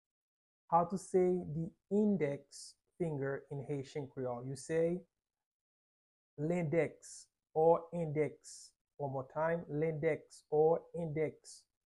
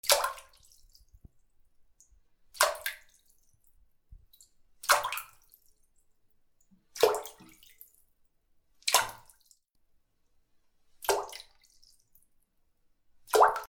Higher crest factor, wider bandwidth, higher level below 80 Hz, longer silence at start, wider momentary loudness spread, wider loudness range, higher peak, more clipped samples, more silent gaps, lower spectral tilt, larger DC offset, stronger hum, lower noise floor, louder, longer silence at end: second, 20 dB vs 32 dB; second, 11.5 kHz vs over 20 kHz; second, -72 dBFS vs -64 dBFS; first, 0.7 s vs 0.05 s; second, 19 LU vs 22 LU; about the same, 5 LU vs 7 LU; second, -16 dBFS vs -4 dBFS; neither; first, 5.46-6.37 s, 8.81-8.85 s vs none; first, -7 dB/octave vs 0.5 dB/octave; neither; neither; first, under -90 dBFS vs -70 dBFS; second, -36 LUFS vs -29 LUFS; first, 0.3 s vs 0.05 s